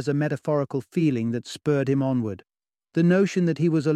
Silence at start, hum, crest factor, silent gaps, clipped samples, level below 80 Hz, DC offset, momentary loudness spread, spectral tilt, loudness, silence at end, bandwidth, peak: 0 s; none; 14 dB; none; under 0.1%; -66 dBFS; under 0.1%; 8 LU; -7.5 dB/octave; -24 LUFS; 0 s; 10.5 kHz; -8 dBFS